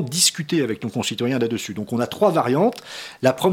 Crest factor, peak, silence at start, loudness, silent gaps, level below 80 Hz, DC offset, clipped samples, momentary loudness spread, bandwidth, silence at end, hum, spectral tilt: 20 dB; -2 dBFS; 0 s; -21 LUFS; none; -64 dBFS; under 0.1%; under 0.1%; 9 LU; 18.5 kHz; 0 s; none; -4 dB/octave